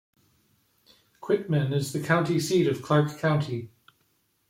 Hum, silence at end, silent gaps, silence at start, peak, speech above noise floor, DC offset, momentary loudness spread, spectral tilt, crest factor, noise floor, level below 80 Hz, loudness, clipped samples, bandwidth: none; 0.85 s; none; 1.2 s; -8 dBFS; 45 dB; under 0.1%; 11 LU; -6 dB/octave; 18 dB; -70 dBFS; -66 dBFS; -26 LUFS; under 0.1%; 16 kHz